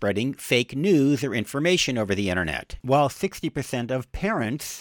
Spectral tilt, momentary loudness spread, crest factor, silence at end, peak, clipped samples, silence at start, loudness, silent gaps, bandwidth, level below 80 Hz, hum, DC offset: -5 dB/octave; 8 LU; 16 dB; 0 s; -8 dBFS; under 0.1%; 0 s; -24 LUFS; none; 19 kHz; -46 dBFS; none; under 0.1%